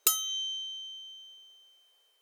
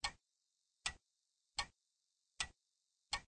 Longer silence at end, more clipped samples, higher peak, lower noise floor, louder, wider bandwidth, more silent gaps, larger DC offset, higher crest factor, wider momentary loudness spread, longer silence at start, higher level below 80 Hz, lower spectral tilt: first, 0.65 s vs 0.05 s; neither; first, -8 dBFS vs -26 dBFS; second, -66 dBFS vs -87 dBFS; first, -32 LUFS vs -46 LUFS; first, over 20 kHz vs 9.4 kHz; neither; neither; about the same, 28 dB vs 24 dB; first, 22 LU vs 4 LU; about the same, 0.05 s vs 0.05 s; second, under -90 dBFS vs -66 dBFS; second, 7 dB/octave vs 0.5 dB/octave